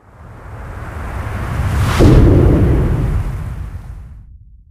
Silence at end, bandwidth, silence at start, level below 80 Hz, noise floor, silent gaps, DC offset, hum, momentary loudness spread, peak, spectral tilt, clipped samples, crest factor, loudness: 0.5 s; 15 kHz; 0.2 s; -18 dBFS; -39 dBFS; none; under 0.1%; none; 23 LU; 0 dBFS; -8 dB/octave; under 0.1%; 14 dB; -14 LUFS